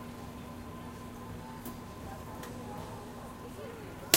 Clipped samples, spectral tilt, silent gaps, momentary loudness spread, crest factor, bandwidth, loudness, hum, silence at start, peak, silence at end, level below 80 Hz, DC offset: under 0.1%; -2.5 dB/octave; none; 2 LU; 36 dB; 16 kHz; -44 LUFS; none; 0 s; -4 dBFS; 0 s; -56 dBFS; under 0.1%